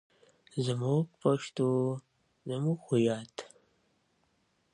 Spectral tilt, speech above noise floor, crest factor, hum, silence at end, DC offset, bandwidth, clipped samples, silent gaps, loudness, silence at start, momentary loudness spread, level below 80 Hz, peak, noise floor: -7 dB/octave; 43 dB; 20 dB; none; 1.3 s; under 0.1%; 10.5 kHz; under 0.1%; none; -32 LUFS; 0.55 s; 14 LU; -76 dBFS; -14 dBFS; -74 dBFS